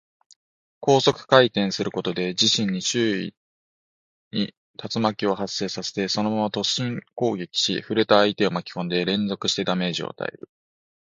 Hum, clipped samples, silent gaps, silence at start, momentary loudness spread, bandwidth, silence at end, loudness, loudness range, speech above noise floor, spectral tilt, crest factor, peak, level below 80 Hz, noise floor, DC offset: none; under 0.1%; 3.37-4.31 s, 4.57-4.74 s; 0.8 s; 11 LU; 9.6 kHz; 0.7 s; -23 LUFS; 5 LU; over 67 dB; -4 dB/octave; 24 dB; 0 dBFS; -64 dBFS; under -90 dBFS; under 0.1%